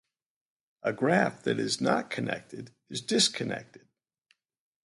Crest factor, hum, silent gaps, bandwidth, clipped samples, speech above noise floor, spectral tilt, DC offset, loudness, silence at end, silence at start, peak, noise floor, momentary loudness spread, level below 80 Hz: 22 dB; none; none; 11.5 kHz; under 0.1%; 43 dB; -3.5 dB/octave; under 0.1%; -29 LUFS; 1.1 s; 0.85 s; -10 dBFS; -73 dBFS; 14 LU; -72 dBFS